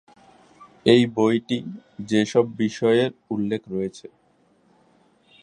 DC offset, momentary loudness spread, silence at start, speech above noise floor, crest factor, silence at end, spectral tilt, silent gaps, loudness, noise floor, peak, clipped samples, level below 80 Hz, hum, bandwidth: under 0.1%; 12 LU; 0.6 s; 40 dB; 22 dB; 1.35 s; -6 dB/octave; none; -22 LUFS; -62 dBFS; -2 dBFS; under 0.1%; -64 dBFS; none; 10.5 kHz